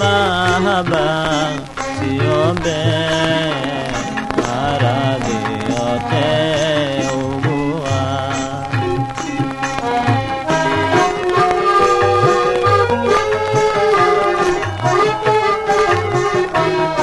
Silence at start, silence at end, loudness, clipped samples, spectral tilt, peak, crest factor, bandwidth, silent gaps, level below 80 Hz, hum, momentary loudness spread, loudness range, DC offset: 0 s; 0 s; -16 LUFS; under 0.1%; -5 dB/octave; 0 dBFS; 16 dB; 11.5 kHz; none; -40 dBFS; none; 7 LU; 5 LU; under 0.1%